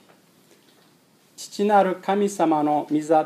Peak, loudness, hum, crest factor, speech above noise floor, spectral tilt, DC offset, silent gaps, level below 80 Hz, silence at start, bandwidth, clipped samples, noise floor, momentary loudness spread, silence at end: -6 dBFS; -21 LUFS; none; 18 dB; 37 dB; -5.5 dB/octave; under 0.1%; none; -84 dBFS; 1.4 s; 14.5 kHz; under 0.1%; -58 dBFS; 10 LU; 0 s